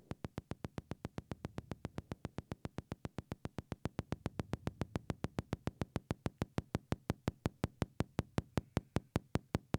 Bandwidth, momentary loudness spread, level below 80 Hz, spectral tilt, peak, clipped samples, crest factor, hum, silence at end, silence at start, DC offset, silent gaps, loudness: 18 kHz; 7 LU; -54 dBFS; -7 dB/octave; -18 dBFS; under 0.1%; 26 dB; none; 0 s; 0.1 s; under 0.1%; none; -44 LUFS